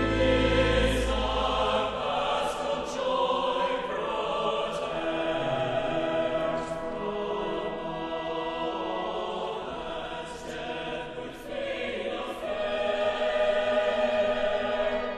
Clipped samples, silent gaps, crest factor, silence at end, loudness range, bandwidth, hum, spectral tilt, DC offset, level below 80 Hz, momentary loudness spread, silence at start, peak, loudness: under 0.1%; none; 16 dB; 0 s; 7 LU; 12.5 kHz; none; -5 dB/octave; under 0.1%; -42 dBFS; 10 LU; 0 s; -12 dBFS; -29 LUFS